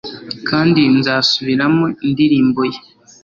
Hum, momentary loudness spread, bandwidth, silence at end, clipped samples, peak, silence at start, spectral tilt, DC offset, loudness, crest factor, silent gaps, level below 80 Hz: none; 10 LU; 7.4 kHz; 0.45 s; under 0.1%; -2 dBFS; 0.05 s; -6 dB/octave; under 0.1%; -14 LUFS; 14 dB; none; -52 dBFS